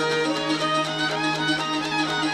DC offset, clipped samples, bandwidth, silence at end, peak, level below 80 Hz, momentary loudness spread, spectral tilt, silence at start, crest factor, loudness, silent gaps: under 0.1%; under 0.1%; 13.5 kHz; 0 s; -10 dBFS; -58 dBFS; 1 LU; -3.5 dB/octave; 0 s; 14 dB; -23 LUFS; none